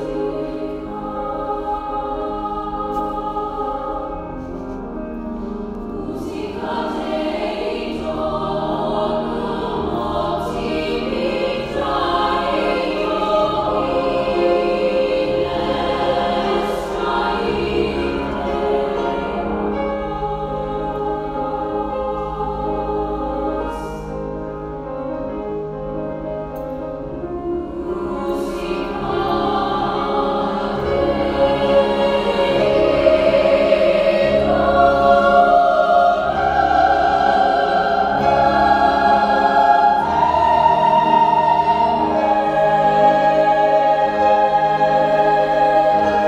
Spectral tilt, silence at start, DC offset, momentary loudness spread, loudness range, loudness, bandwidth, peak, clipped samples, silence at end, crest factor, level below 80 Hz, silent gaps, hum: -6.5 dB/octave; 0 s; under 0.1%; 13 LU; 11 LU; -18 LUFS; 13 kHz; 0 dBFS; under 0.1%; 0 s; 18 dB; -38 dBFS; none; none